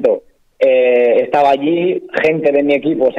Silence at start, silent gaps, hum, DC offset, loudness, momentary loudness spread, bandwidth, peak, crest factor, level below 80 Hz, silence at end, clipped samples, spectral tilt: 0 s; none; none; under 0.1%; -13 LUFS; 6 LU; 6.8 kHz; -4 dBFS; 10 dB; -58 dBFS; 0 s; under 0.1%; -7 dB/octave